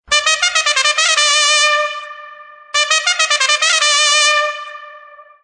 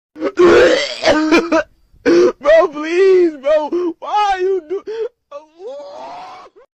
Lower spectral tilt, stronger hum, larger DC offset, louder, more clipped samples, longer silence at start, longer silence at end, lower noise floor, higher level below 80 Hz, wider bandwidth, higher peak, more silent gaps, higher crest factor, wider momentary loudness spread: second, 5 dB/octave vs -4 dB/octave; neither; neither; about the same, -12 LUFS vs -14 LUFS; neither; about the same, 0.1 s vs 0.15 s; second, 0.25 s vs 0.4 s; about the same, -40 dBFS vs -37 dBFS; second, -58 dBFS vs -46 dBFS; first, 10.5 kHz vs 8.6 kHz; about the same, 0 dBFS vs -2 dBFS; neither; about the same, 16 dB vs 12 dB; second, 11 LU vs 21 LU